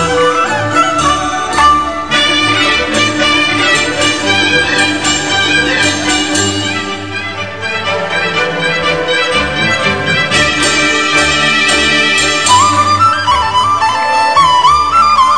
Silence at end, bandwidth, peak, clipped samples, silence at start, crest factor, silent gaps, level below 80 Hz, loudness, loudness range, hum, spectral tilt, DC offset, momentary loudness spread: 0 s; 10.5 kHz; 0 dBFS; under 0.1%; 0 s; 12 dB; none; -36 dBFS; -10 LUFS; 5 LU; none; -2.5 dB/octave; 2%; 6 LU